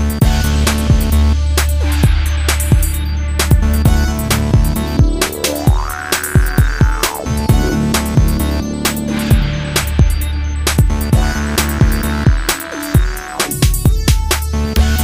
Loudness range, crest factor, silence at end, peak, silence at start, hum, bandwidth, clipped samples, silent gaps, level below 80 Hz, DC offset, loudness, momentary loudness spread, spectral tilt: 1 LU; 12 dB; 0 s; 0 dBFS; 0 s; none; 16.5 kHz; under 0.1%; none; -16 dBFS; under 0.1%; -15 LUFS; 4 LU; -5 dB/octave